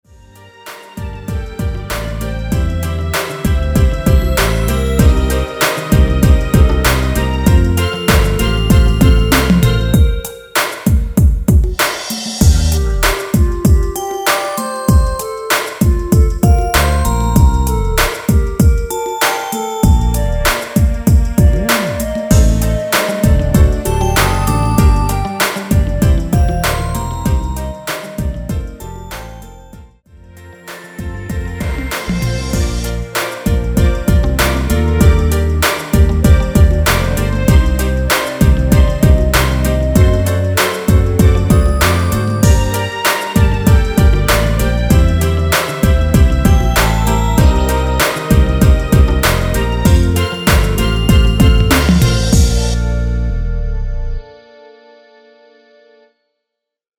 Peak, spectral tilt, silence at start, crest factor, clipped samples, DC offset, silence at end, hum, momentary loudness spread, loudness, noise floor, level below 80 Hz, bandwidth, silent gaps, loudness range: 0 dBFS; -5.5 dB/octave; 0.65 s; 12 dB; under 0.1%; under 0.1%; 2.65 s; none; 10 LU; -13 LUFS; -78 dBFS; -16 dBFS; over 20 kHz; none; 9 LU